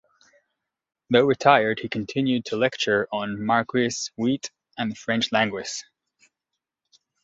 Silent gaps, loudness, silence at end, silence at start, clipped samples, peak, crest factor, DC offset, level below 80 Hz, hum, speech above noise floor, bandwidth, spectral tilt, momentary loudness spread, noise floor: none; -23 LUFS; 1.4 s; 1.1 s; under 0.1%; -2 dBFS; 24 dB; under 0.1%; -64 dBFS; none; 61 dB; 8 kHz; -4.5 dB/octave; 12 LU; -84 dBFS